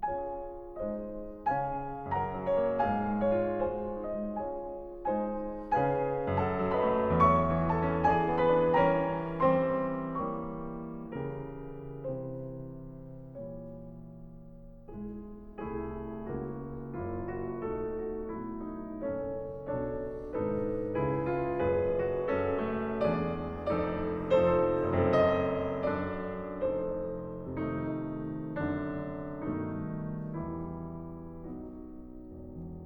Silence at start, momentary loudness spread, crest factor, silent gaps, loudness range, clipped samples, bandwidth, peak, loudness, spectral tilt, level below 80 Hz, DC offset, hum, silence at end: 0 s; 17 LU; 20 dB; none; 14 LU; under 0.1%; 6.2 kHz; -12 dBFS; -32 LUFS; -9.5 dB/octave; -50 dBFS; under 0.1%; none; 0 s